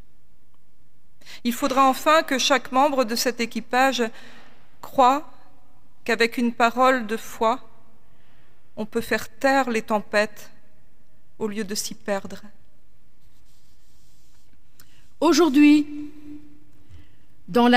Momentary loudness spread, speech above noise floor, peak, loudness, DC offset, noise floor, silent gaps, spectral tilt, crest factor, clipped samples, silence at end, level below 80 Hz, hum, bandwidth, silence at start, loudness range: 15 LU; 43 dB; -2 dBFS; -21 LUFS; 2%; -64 dBFS; none; -3 dB/octave; 20 dB; under 0.1%; 0 s; -58 dBFS; none; 16 kHz; 1.3 s; 12 LU